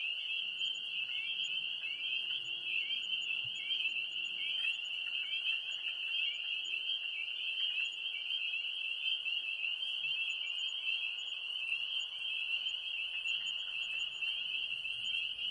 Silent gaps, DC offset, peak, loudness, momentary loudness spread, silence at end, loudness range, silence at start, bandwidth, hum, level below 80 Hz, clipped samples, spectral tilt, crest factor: none; under 0.1%; -22 dBFS; -35 LUFS; 3 LU; 0 s; 1 LU; 0 s; 11.5 kHz; none; -80 dBFS; under 0.1%; 2 dB/octave; 16 dB